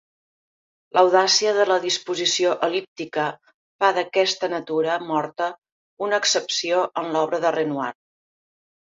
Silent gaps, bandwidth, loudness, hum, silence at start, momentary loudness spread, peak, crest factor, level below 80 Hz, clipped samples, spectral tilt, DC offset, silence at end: 2.88-2.96 s, 3.54-3.79 s, 5.58-5.62 s, 5.72-5.97 s; 7.8 kHz; -21 LUFS; none; 0.95 s; 11 LU; -4 dBFS; 20 dB; -74 dBFS; under 0.1%; -2 dB/octave; under 0.1%; 1.1 s